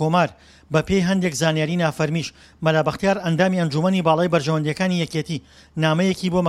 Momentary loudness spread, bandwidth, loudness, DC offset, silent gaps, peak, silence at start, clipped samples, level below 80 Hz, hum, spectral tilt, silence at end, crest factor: 6 LU; 13.5 kHz; -21 LUFS; under 0.1%; none; -4 dBFS; 0 s; under 0.1%; -50 dBFS; none; -6 dB/octave; 0 s; 18 dB